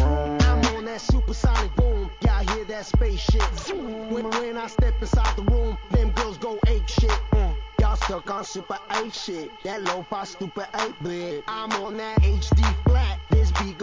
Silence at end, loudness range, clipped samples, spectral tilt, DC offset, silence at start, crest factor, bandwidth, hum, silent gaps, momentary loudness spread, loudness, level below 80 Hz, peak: 0 s; 5 LU; under 0.1%; -6 dB/octave; 0.1%; 0 s; 14 dB; 7.6 kHz; none; none; 9 LU; -25 LUFS; -24 dBFS; -8 dBFS